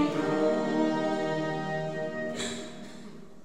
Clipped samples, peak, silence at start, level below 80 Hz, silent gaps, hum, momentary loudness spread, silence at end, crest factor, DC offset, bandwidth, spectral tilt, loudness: under 0.1%; -14 dBFS; 0 s; -66 dBFS; none; none; 17 LU; 0.05 s; 16 dB; 0.5%; 11.5 kHz; -5.5 dB/octave; -30 LUFS